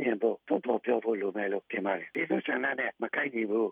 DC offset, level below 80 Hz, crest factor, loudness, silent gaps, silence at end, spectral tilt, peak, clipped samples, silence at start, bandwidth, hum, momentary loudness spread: under 0.1%; -90 dBFS; 16 dB; -31 LUFS; none; 0 s; -8 dB/octave; -14 dBFS; under 0.1%; 0 s; 4.5 kHz; none; 3 LU